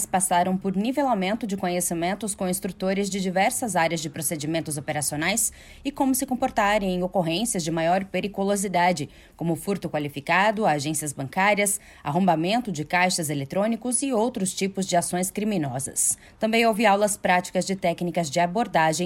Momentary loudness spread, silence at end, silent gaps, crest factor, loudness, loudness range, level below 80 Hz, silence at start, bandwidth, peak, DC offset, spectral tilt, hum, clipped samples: 7 LU; 0 s; none; 18 dB; -24 LUFS; 2 LU; -54 dBFS; 0 s; 16.5 kHz; -8 dBFS; under 0.1%; -4 dB/octave; none; under 0.1%